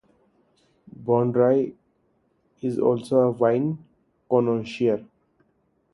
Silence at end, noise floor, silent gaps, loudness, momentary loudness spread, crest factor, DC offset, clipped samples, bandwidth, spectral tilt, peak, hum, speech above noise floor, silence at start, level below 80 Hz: 0.9 s; -68 dBFS; none; -23 LUFS; 12 LU; 18 dB; under 0.1%; under 0.1%; 11.5 kHz; -8.5 dB/octave; -6 dBFS; none; 46 dB; 1 s; -66 dBFS